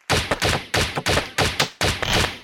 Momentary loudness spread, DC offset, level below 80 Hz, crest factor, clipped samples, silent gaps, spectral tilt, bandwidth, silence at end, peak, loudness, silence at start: 2 LU; 0.1%; -34 dBFS; 18 dB; under 0.1%; none; -3 dB/octave; 17 kHz; 0 s; -4 dBFS; -21 LUFS; 0.1 s